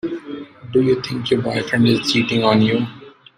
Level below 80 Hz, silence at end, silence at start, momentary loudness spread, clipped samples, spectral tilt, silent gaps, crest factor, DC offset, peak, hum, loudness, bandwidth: -54 dBFS; 0.3 s; 0.05 s; 14 LU; under 0.1%; -6 dB/octave; none; 16 dB; under 0.1%; -2 dBFS; none; -18 LUFS; 15 kHz